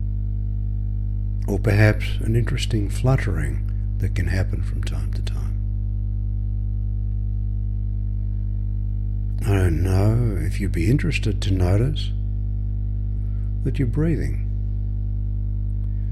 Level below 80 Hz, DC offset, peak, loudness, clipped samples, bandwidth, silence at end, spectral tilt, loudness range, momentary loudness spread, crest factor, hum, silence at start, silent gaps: -26 dBFS; under 0.1%; -4 dBFS; -24 LUFS; under 0.1%; 12 kHz; 0 s; -7 dB/octave; 5 LU; 7 LU; 18 dB; 50 Hz at -25 dBFS; 0 s; none